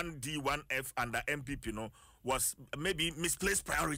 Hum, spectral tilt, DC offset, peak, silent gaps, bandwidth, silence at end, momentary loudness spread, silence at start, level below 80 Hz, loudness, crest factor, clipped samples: none; -2.5 dB/octave; under 0.1%; -22 dBFS; none; 16 kHz; 0 s; 9 LU; 0 s; -52 dBFS; -35 LUFS; 16 dB; under 0.1%